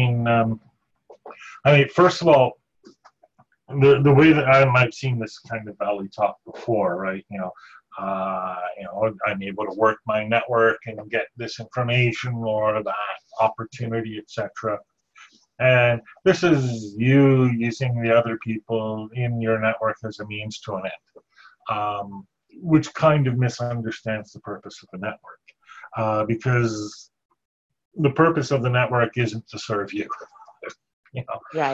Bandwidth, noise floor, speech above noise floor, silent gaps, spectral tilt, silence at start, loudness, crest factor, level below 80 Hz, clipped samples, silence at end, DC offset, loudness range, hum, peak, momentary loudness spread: 7.8 kHz; -59 dBFS; 38 dB; 27.25-27.29 s, 27.45-27.69 s, 27.85-27.91 s, 30.93-31.03 s; -7 dB/octave; 0 s; -22 LUFS; 20 dB; -56 dBFS; under 0.1%; 0 s; under 0.1%; 8 LU; none; -2 dBFS; 17 LU